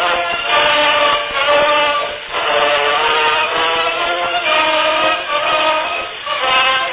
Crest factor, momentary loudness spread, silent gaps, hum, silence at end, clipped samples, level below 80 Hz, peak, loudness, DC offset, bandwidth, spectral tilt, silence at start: 14 dB; 6 LU; none; none; 0 s; under 0.1%; -48 dBFS; 0 dBFS; -14 LUFS; under 0.1%; 4 kHz; -5.5 dB/octave; 0 s